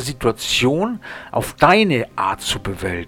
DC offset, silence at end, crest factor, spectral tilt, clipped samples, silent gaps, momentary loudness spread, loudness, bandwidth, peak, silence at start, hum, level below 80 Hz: under 0.1%; 0 s; 18 dB; -4.5 dB/octave; under 0.1%; none; 11 LU; -18 LUFS; 18.5 kHz; 0 dBFS; 0 s; none; -40 dBFS